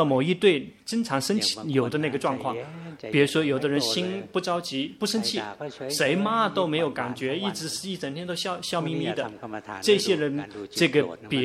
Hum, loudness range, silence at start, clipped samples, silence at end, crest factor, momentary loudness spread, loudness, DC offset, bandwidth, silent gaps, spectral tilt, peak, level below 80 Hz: none; 2 LU; 0 s; under 0.1%; 0 s; 20 dB; 10 LU; -26 LUFS; under 0.1%; 15.5 kHz; none; -4.5 dB/octave; -4 dBFS; -68 dBFS